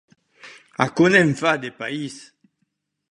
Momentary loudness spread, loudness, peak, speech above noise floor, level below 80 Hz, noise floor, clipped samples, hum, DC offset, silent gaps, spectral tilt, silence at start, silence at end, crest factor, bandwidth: 19 LU; -19 LUFS; 0 dBFS; 54 dB; -60 dBFS; -74 dBFS; under 0.1%; none; under 0.1%; none; -5.5 dB/octave; 0.45 s; 0.9 s; 22 dB; 11.5 kHz